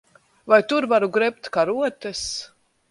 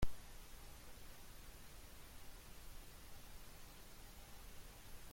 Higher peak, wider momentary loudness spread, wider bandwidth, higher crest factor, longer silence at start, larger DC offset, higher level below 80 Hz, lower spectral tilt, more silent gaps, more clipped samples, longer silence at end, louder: first, -2 dBFS vs -24 dBFS; first, 11 LU vs 0 LU; second, 11.5 kHz vs 16.5 kHz; about the same, 20 dB vs 22 dB; first, 0.45 s vs 0 s; neither; about the same, -58 dBFS vs -56 dBFS; about the same, -3.5 dB/octave vs -4 dB/octave; neither; neither; first, 0.45 s vs 0 s; first, -21 LUFS vs -58 LUFS